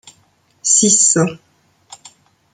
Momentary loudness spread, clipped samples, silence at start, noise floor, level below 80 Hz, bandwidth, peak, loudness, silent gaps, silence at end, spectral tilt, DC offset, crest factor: 12 LU; under 0.1%; 0.65 s; -57 dBFS; -64 dBFS; 10.5 kHz; 0 dBFS; -12 LUFS; none; 1.2 s; -2.5 dB/octave; under 0.1%; 18 dB